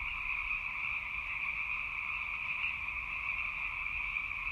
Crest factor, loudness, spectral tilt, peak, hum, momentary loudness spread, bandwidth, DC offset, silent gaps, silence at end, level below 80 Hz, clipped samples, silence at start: 16 dB; -35 LUFS; -3 dB/octave; -22 dBFS; none; 2 LU; 15.5 kHz; under 0.1%; none; 0 s; -54 dBFS; under 0.1%; 0 s